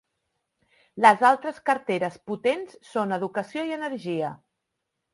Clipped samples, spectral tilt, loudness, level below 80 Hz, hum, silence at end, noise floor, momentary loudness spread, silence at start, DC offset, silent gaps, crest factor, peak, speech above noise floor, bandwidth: under 0.1%; -5 dB/octave; -25 LUFS; -74 dBFS; none; 0.75 s; -81 dBFS; 13 LU; 0.95 s; under 0.1%; none; 24 dB; -2 dBFS; 57 dB; 11.5 kHz